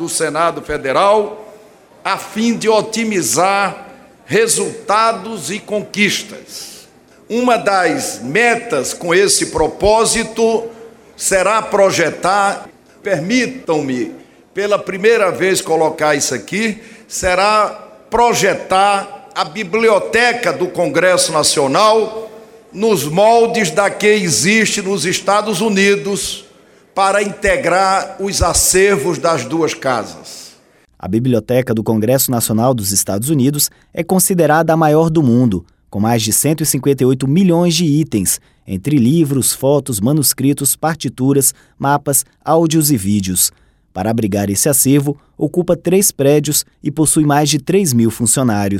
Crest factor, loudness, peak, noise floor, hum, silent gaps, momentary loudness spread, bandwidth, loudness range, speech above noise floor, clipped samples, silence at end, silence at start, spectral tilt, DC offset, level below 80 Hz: 14 dB; -14 LUFS; 0 dBFS; -49 dBFS; none; none; 10 LU; 17 kHz; 3 LU; 35 dB; under 0.1%; 0 s; 0 s; -4 dB/octave; under 0.1%; -42 dBFS